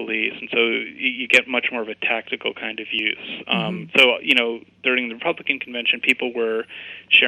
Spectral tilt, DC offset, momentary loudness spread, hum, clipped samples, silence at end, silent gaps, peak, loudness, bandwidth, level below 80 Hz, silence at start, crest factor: -3.5 dB/octave; under 0.1%; 11 LU; none; under 0.1%; 0 s; none; -2 dBFS; -20 LUFS; 11.5 kHz; -70 dBFS; 0 s; 20 dB